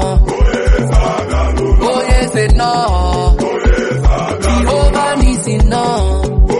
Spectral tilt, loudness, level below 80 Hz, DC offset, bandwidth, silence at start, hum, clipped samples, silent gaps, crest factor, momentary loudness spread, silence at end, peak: -6 dB/octave; -13 LUFS; -12 dBFS; under 0.1%; 11.5 kHz; 0 s; none; under 0.1%; none; 10 dB; 2 LU; 0 s; 0 dBFS